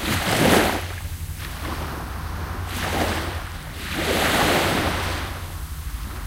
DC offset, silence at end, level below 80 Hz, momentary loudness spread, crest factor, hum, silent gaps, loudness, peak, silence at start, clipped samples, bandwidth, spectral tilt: under 0.1%; 0 s; -34 dBFS; 14 LU; 20 dB; none; none; -24 LUFS; -4 dBFS; 0 s; under 0.1%; 16 kHz; -4 dB/octave